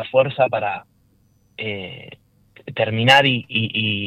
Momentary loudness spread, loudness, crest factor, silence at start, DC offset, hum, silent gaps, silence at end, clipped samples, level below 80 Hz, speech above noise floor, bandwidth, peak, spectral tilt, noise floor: 19 LU; -18 LUFS; 18 dB; 0 s; under 0.1%; none; none; 0 s; under 0.1%; -60 dBFS; 39 dB; 14.5 kHz; -2 dBFS; -5 dB/octave; -59 dBFS